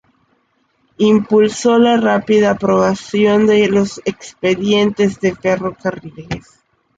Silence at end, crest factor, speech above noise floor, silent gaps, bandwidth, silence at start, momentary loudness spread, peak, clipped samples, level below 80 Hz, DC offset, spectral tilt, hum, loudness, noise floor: 0.6 s; 14 dB; 47 dB; none; 9.2 kHz; 1 s; 12 LU; -2 dBFS; under 0.1%; -50 dBFS; under 0.1%; -5.5 dB/octave; none; -14 LUFS; -61 dBFS